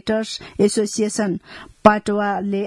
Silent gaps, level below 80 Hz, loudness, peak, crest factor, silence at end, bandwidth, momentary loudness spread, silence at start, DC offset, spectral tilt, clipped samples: none; -52 dBFS; -20 LUFS; 0 dBFS; 20 dB; 0 s; 12 kHz; 11 LU; 0.05 s; under 0.1%; -4.5 dB/octave; under 0.1%